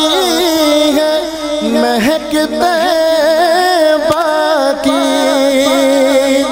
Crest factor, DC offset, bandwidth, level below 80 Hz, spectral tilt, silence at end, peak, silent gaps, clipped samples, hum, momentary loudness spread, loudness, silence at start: 10 dB; under 0.1%; 16 kHz; -44 dBFS; -2.5 dB/octave; 0 s; 0 dBFS; none; under 0.1%; none; 4 LU; -11 LUFS; 0 s